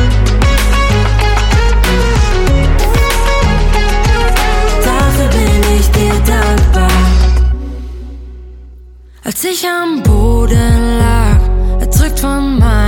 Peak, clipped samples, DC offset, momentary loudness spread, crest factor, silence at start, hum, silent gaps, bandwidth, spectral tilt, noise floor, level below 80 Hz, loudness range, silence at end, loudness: 0 dBFS; under 0.1%; under 0.1%; 5 LU; 10 dB; 0 s; none; none; 17.5 kHz; -5.5 dB/octave; -35 dBFS; -12 dBFS; 4 LU; 0 s; -11 LUFS